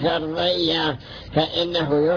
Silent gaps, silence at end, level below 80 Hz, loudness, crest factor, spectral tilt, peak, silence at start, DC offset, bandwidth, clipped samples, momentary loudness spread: none; 0 s; -46 dBFS; -22 LUFS; 16 dB; -6.5 dB/octave; -6 dBFS; 0 s; under 0.1%; 5.4 kHz; under 0.1%; 6 LU